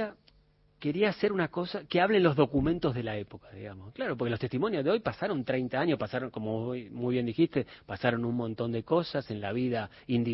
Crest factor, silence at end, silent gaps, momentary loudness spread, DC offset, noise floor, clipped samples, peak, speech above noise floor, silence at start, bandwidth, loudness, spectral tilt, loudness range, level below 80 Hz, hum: 22 dB; 0 s; none; 10 LU; under 0.1%; -64 dBFS; under 0.1%; -8 dBFS; 35 dB; 0 s; 5.8 kHz; -30 LUFS; -10.5 dB/octave; 3 LU; -56 dBFS; none